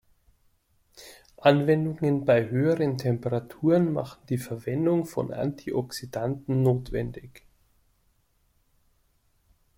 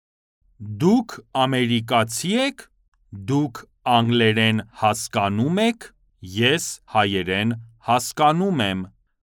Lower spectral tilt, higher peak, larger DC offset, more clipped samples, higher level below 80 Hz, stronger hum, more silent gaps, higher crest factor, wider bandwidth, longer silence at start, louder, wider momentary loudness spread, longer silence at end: first, -7.5 dB/octave vs -4.5 dB/octave; second, -6 dBFS vs -2 dBFS; neither; neither; first, -54 dBFS vs -60 dBFS; neither; second, none vs 2.88-2.92 s; about the same, 22 dB vs 20 dB; second, 16.5 kHz vs 19 kHz; first, 1 s vs 0.6 s; second, -26 LUFS vs -21 LUFS; about the same, 10 LU vs 12 LU; first, 2.4 s vs 0.35 s